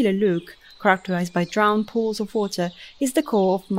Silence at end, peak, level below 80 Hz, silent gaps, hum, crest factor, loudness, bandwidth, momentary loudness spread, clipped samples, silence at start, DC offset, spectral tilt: 0 s; -4 dBFS; -60 dBFS; none; none; 18 dB; -22 LUFS; 16 kHz; 7 LU; under 0.1%; 0 s; under 0.1%; -5.5 dB/octave